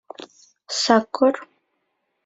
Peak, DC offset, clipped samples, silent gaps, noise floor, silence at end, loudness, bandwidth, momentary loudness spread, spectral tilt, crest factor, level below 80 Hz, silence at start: -2 dBFS; under 0.1%; under 0.1%; none; -74 dBFS; 0.8 s; -20 LUFS; 8.2 kHz; 22 LU; -3 dB/octave; 22 dB; -66 dBFS; 0.2 s